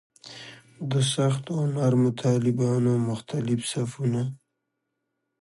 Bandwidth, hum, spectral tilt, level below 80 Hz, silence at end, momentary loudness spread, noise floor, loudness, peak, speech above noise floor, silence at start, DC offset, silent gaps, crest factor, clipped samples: 11.5 kHz; none; -6.5 dB/octave; -66 dBFS; 1.05 s; 17 LU; -80 dBFS; -25 LUFS; -10 dBFS; 56 dB; 0.25 s; under 0.1%; none; 16 dB; under 0.1%